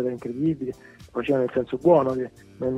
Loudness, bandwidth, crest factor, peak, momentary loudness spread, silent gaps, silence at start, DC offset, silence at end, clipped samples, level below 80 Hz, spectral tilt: -24 LUFS; 10.5 kHz; 18 dB; -6 dBFS; 15 LU; none; 0 s; under 0.1%; 0 s; under 0.1%; -56 dBFS; -8.5 dB/octave